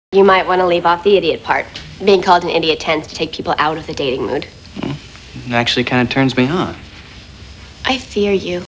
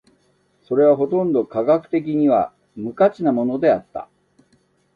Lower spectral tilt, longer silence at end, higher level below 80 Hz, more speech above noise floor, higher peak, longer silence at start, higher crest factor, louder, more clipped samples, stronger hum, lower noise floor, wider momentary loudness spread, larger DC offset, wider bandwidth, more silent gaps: second, -5.5 dB/octave vs -9.5 dB/octave; second, 0.1 s vs 0.9 s; first, -42 dBFS vs -62 dBFS; second, 21 dB vs 44 dB; first, 0 dBFS vs -4 dBFS; second, 0.1 s vs 0.7 s; about the same, 16 dB vs 16 dB; first, -15 LUFS vs -19 LUFS; neither; neither; second, -36 dBFS vs -62 dBFS; first, 19 LU vs 14 LU; neither; first, 8 kHz vs 4.9 kHz; neither